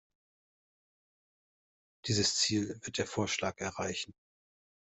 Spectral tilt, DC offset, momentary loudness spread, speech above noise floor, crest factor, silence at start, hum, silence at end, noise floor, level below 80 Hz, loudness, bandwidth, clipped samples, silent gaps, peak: -3 dB/octave; under 0.1%; 11 LU; over 56 dB; 22 dB; 2.05 s; none; 0.7 s; under -90 dBFS; -70 dBFS; -33 LUFS; 8.2 kHz; under 0.1%; none; -16 dBFS